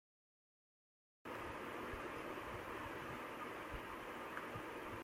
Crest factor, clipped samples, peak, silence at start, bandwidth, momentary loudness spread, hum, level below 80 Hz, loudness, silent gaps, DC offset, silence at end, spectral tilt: 18 dB; under 0.1%; -32 dBFS; 1.25 s; 16.5 kHz; 2 LU; none; -64 dBFS; -48 LUFS; none; under 0.1%; 0 s; -5 dB/octave